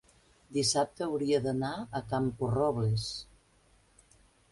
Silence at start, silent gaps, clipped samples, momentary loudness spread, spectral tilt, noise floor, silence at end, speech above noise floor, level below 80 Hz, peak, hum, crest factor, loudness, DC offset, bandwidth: 0.5 s; none; under 0.1%; 9 LU; -5 dB/octave; -65 dBFS; 1.3 s; 35 dB; -58 dBFS; -16 dBFS; none; 18 dB; -31 LUFS; under 0.1%; 11.5 kHz